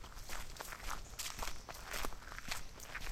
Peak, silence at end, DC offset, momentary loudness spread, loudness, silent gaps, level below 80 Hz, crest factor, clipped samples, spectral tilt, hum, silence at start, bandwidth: -22 dBFS; 0 s; under 0.1%; 5 LU; -46 LUFS; none; -50 dBFS; 22 dB; under 0.1%; -1.5 dB/octave; none; 0 s; 17 kHz